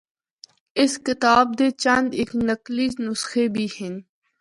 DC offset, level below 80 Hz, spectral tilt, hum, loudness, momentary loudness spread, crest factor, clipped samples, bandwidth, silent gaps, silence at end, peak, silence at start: under 0.1%; -56 dBFS; -4 dB/octave; none; -21 LUFS; 12 LU; 20 dB; under 0.1%; 11.5 kHz; none; 0.4 s; -4 dBFS; 0.75 s